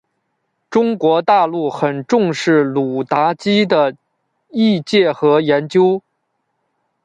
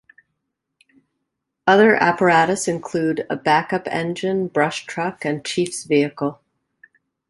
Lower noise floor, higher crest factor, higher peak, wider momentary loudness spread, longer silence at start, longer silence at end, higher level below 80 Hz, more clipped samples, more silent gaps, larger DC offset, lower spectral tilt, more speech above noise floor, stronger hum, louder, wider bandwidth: second, -70 dBFS vs -78 dBFS; second, 14 dB vs 20 dB; about the same, -2 dBFS vs -2 dBFS; second, 6 LU vs 10 LU; second, 0.7 s vs 1.65 s; about the same, 1.05 s vs 0.95 s; about the same, -62 dBFS vs -62 dBFS; neither; neither; neither; first, -6 dB/octave vs -4.5 dB/octave; about the same, 56 dB vs 59 dB; neither; first, -15 LUFS vs -19 LUFS; second, 9.2 kHz vs 11.5 kHz